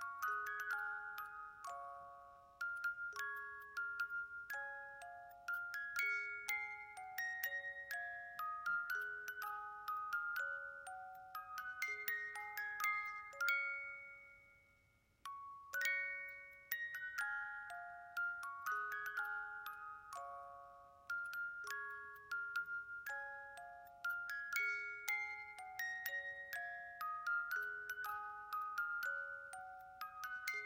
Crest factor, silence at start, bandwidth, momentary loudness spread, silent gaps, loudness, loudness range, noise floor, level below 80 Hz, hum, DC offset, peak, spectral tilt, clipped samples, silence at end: 22 dB; 0 s; 16.5 kHz; 12 LU; none; -44 LUFS; 4 LU; -75 dBFS; -82 dBFS; none; under 0.1%; -24 dBFS; 0.5 dB/octave; under 0.1%; 0 s